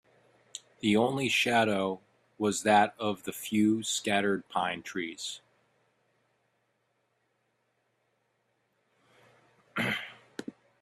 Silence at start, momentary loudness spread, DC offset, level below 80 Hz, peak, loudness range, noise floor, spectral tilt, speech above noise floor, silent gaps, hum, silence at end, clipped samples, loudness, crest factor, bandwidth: 0.55 s; 20 LU; under 0.1%; -72 dBFS; -12 dBFS; 15 LU; -76 dBFS; -4 dB/octave; 47 dB; none; none; 0.3 s; under 0.1%; -29 LUFS; 20 dB; 15 kHz